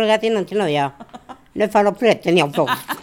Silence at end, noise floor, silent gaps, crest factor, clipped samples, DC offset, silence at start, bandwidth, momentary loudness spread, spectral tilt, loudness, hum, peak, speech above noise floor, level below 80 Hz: 0 s; -40 dBFS; none; 18 dB; under 0.1%; under 0.1%; 0 s; 18.5 kHz; 9 LU; -5 dB/octave; -18 LUFS; none; 0 dBFS; 22 dB; -58 dBFS